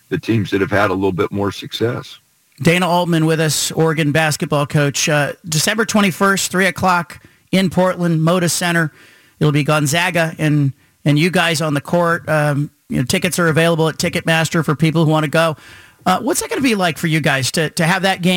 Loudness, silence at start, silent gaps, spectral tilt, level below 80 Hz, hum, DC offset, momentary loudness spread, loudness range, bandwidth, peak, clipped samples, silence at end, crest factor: -16 LUFS; 0.1 s; none; -4.5 dB/octave; -50 dBFS; none; under 0.1%; 5 LU; 1 LU; 17 kHz; -2 dBFS; under 0.1%; 0 s; 14 dB